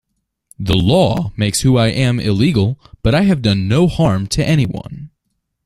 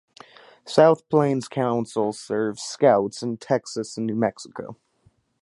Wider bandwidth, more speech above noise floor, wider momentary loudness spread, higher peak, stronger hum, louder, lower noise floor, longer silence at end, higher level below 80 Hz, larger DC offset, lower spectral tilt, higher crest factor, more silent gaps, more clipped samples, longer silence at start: first, 14 kHz vs 11.5 kHz; first, 57 dB vs 40 dB; second, 8 LU vs 14 LU; about the same, 0 dBFS vs -2 dBFS; neither; first, -15 LUFS vs -23 LUFS; first, -71 dBFS vs -63 dBFS; about the same, 0.6 s vs 0.7 s; first, -34 dBFS vs -68 dBFS; neither; about the same, -6 dB/octave vs -6 dB/octave; second, 14 dB vs 22 dB; neither; neither; about the same, 0.6 s vs 0.65 s